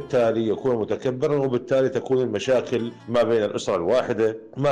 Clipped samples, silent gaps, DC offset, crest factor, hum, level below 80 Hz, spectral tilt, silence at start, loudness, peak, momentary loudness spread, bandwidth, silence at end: under 0.1%; none; under 0.1%; 10 dB; none; -58 dBFS; -6.5 dB/octave; 0 s; -23 LUFS; -12 dBFS; 4 LU; 10 kHz; 0 s